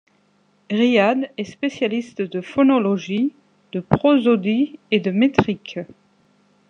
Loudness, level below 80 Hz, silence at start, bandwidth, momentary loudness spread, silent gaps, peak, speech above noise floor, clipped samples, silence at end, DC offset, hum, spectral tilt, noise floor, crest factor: -19 LUFS; -56 dBFS; 0.7 s; 7.4 kHz; 13 LU; none; -2 dBFS; 42 dB; under 0.1%; 0.85 s; under 0.1%; 50 Hz at -45 dBFS; -7 dB/octave; -61 dBFS; 18 dB